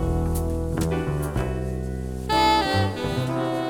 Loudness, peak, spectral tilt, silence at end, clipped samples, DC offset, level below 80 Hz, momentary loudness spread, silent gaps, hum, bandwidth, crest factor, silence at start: -24 LUFS; -6 dBFS; -6 dB/octave; 0 s; under 0.1%; under 0.1%; -32 dBFS; 10 LU; none; none; over 20 kHz; 18 dB; 0 s